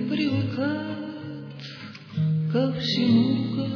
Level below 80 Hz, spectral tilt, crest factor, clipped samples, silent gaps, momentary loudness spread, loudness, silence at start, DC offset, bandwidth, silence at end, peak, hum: -64 dBFS; -7.5 dB/octave; 16 dB; under 0.1%; none; 17 LU; -25 LUFS; 0 s; under 0.1%; 5.4 kHz; 0 s; -10 dBFS; none